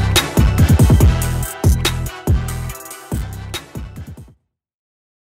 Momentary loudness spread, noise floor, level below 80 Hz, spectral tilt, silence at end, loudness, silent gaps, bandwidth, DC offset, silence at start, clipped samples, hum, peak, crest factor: 20 LU; -52 dBFS; -22 dBFS; -5 dB/octave; 1.1 s; -16 LUFS; none; 16.5 kHz; under 0.1%; 0 s; under 0.1%; none; 0 dBFS; 16 dB